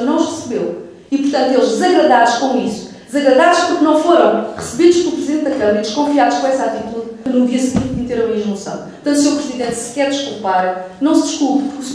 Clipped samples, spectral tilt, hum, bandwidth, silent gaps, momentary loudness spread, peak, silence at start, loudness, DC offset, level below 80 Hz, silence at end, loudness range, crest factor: under 0.1%; -4 dB/octave; none; 11 kHz; none; 11 LU; 0 dBFS; 0 s; -15 LUFS; under 0.1%; -48 dBFS; 0 s; 5 LU; 14 dB